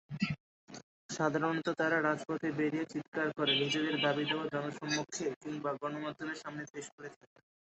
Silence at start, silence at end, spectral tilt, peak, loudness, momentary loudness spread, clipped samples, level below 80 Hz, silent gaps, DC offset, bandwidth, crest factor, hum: 0.1 s; 0.6 s; -3 dB/octave; -16 dBFS; -35 LUFS; 15 LU; under 0.1%; -74 dBFS; 0.40-0.67 s, 0.83-1.09 s, 3.08-3.12 s, 5.36-5.41 s, 6.70-6.74 s, 6.92-6.98 s; under 0.1%; 8 kHz; 20 dB; none